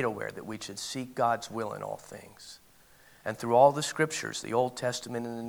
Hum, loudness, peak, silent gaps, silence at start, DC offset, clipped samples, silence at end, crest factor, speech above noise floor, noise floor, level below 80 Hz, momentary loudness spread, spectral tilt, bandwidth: none; -30 LUFS; -8 dBFS; none; 0 s; under 0.1%; under 0.1%; 0 s; 22 dB; 28 dB; -58 dBFS; -70 dBFS; 21 LU; -4 dB/octave; over 20 kHz